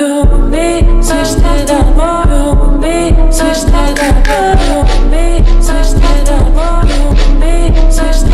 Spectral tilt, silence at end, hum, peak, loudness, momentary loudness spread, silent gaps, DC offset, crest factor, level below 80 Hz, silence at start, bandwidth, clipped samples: -5.5 dB/octave; 0 s; none; 0 dBFS; -11 LUFS; 2 LU; none; under 0.1%; 6 dB; -8 dBFS; 0 s; 13 kHz; 0.5%